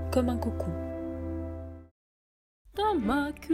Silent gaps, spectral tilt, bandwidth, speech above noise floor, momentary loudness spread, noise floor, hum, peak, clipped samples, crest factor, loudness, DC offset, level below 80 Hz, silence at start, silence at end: 1.91-2.65 s; -7 dB/octave; 16 kHz; over 61 dB; 14 LU; under -90 dBFS; none; -14 dBFS; under 0.1%; 18 dB; -31 LUFS; under 0.1%; -44 dBFS; 0 s; 0 s